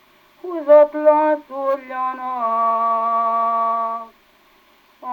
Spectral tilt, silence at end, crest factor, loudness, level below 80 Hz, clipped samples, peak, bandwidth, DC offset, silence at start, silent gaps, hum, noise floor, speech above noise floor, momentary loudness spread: -6 dB/octave; 0 s; 18 dB; -18 LUFS; -70 dBFS; under 0.1%; -2 dBFS; 4.7 kHz; under 0.1%; 0.45 s; none; 50 Hz at -75 dBFS; -54 dBFS; 37 dB; 14 LU